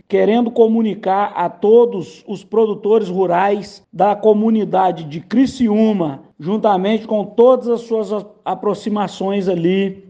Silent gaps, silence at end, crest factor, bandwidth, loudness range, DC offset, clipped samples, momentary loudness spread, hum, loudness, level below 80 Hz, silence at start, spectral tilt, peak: none; 0.1 s; 16 dB; 8.6 kHz; 2 LU; under 0.1%; under 0.1%; 11 LU; none; -16 LUFS; -58 dBFS; 0.1 s; -7.5 dB/octave; 0 dBFS